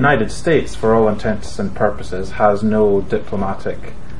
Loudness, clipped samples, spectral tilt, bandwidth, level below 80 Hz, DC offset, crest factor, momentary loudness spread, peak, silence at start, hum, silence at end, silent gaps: -18 LUFS; under 0.1%; -6.5 dB/octave; 11.5 kHz; -34 dBFS; 8%; 16 dB; 11 LU; 0 dBFS; 0 s; none; 0 s; none